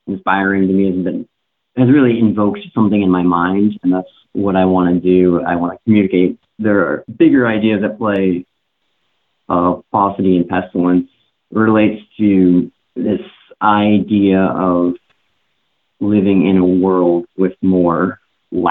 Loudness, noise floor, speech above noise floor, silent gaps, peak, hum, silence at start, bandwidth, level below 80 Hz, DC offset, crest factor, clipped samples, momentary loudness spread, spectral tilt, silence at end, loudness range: -14 LUFS; -68 dBFS; 55 dB; none; 0 dBFS; none; 0.05 s; 4 kHz; -52 dBFS; under 0.1%; 14 dB; under 0.1%; 8 LU; -11 dB/octave; 0 s; 2 LU